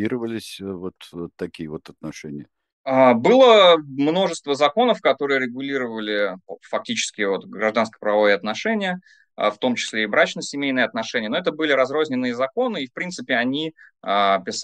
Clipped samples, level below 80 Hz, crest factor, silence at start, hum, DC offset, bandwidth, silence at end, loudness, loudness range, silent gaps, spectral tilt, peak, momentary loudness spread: under 0.1%; -66 dBFS; 20 dB; 0 s; none; under 0.1%; 12 kHz; 0 s; -20 LUFS; 6 LU; 2.73-2.84 s; -4 dB/octave; -2 dBFS; 18 LU